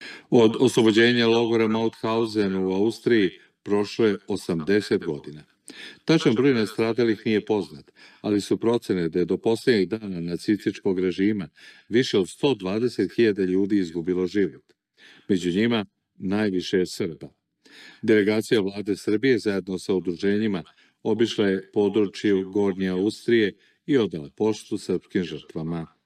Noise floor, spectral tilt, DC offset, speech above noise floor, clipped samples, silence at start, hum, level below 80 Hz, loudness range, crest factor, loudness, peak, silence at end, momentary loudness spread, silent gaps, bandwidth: -54 dBFS; -6 dB/octave; under 0.1%; 31 dB; under 0.1%; 0 s; none; -66 dBFS; 3 LU; 18 dB; -24 LUFS; -4 dBFS; 0.2 s; 11 LU; none; 13.5 kHz